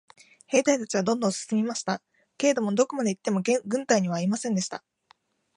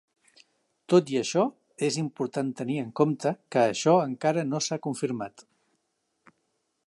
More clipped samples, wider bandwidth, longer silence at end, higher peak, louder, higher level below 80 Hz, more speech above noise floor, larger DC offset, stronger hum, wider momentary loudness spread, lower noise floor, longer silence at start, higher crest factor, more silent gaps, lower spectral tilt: neither; about the same, 11 kHz vs 11.5 kHz; second, 0.8 s vs 1.45 s; about the same, -6 dBFS vs -8 dBFS; about the same, -26 LUFS vs -27 LUFS; about the same, -74 dBFS vs -76 dBFS; second, 38 dB vs 51 dB; neither; neither; about the same, 6 LU vs 8 LU; second, -64 dBFS vs -77 dBFS; second, 0.5 s vs 0.9 s; about the same, 20 dB vs 20 dB; neither; about the same, -4.5 dB/octave vs -5.5 dB/octave